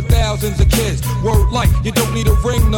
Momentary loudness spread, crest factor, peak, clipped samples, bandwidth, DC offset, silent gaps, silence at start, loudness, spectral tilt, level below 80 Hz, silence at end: 3 LU; 12 dB; -2 dBFS; under 0.1%; 17 kHz; under 0.1%; none; 0 s; -16 LUFS; -5.5 dB/octave; -18 dBFS; 0 s